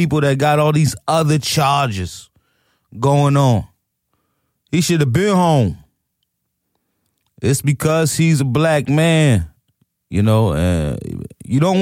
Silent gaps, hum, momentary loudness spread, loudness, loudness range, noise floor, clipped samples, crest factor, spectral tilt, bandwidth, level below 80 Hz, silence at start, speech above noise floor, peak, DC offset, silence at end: none; none; 10 LU; -16 LUFS; 3 LU; -73 dBFS; under 0.1%; 14 dB; -6 dB/octave; 16 kHz; -40 dBFS; 0 s; 58 dB; -4 dBFS; under 0.1%; 0 s